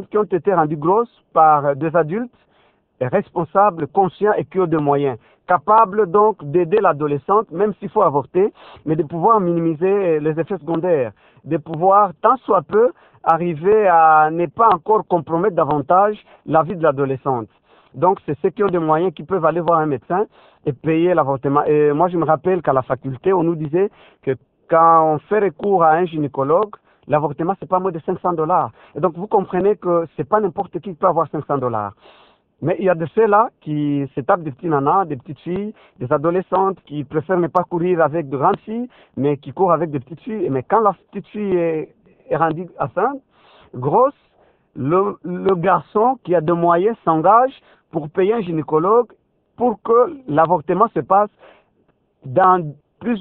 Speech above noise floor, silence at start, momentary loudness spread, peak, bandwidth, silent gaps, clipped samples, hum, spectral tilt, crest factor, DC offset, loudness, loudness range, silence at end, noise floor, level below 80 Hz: 45 dB; 0 s; 11 LU; 0 dBFS; 4.1 kHz; none; under 0.1%; none; -11 dB/octave; 18 dB; under 0.1%; -18 LUFS; 5 LU; 0 s; -62 dBFS; -58 dBFS